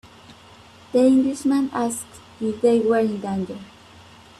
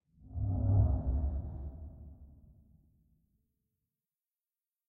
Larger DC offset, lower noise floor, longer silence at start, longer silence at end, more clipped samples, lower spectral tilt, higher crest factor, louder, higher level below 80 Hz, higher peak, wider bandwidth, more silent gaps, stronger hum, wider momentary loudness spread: neither; second, -47 dBFS vs under -90 dBFS; about the same, 0.3 s vs 0.25 s; second, 0.7 s vs 2.6 s; neither; second, -5.5 dB/octave vs -14 dB/octave; about the same, 16 dB vs 18 dB; first, -21 LUFS vs -34 LUFS; second, -60 dBFS vs -40 dBFS; first, -6 dBFS vs -18 dBFS; first, 13 kHz vs 1.6 kHz; neither; neither; second, 15 LU vs 21 LU